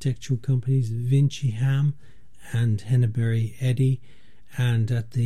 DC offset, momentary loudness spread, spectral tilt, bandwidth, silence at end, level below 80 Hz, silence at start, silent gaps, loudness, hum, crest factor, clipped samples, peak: 1%; 6 LU; -7.5 dB/octave; 11.5 kHz; 0 s; -58 dBFS; 0 s; none; -24 LUFS; none; 12 dB; under 0.1%; -10 dBFS